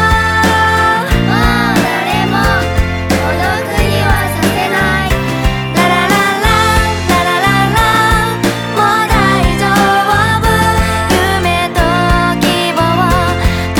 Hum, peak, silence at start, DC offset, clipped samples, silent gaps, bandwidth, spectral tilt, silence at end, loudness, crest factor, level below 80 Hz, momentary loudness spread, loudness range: none; 0 dBFS; 0 s; under 0.1%; under 0.1%; none; over 20 kHz; -5 dB/octave; 0 s; -11 LUFS; 10 dB; -22 dBFS; 4 LU; 2 LU